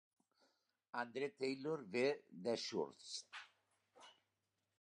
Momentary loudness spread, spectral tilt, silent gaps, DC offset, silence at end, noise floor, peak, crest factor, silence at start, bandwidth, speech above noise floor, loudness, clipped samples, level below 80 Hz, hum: 16 LU; -4 dB/octave; none; under 0.1%; 0.7 s; -89 dBFS; -26 dBFS; 20 dB; 0.95 s; 11 kHz; 45 dB; -44 LUFS; under 0.1%; under -90 dBFS; none